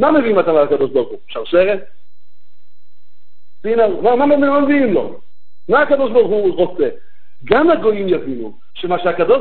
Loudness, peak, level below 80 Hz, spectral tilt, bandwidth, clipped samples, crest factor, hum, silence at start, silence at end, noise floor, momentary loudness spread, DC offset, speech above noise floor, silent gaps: -15 LUFS; 0 dBFS; -52 dBFS; -10 dB/octave; 4.5 kHz; under 0.1%; 14 dB; none; 0 s; 0 s; -68 dBFS; 14 LU; 7%; 54 dB; none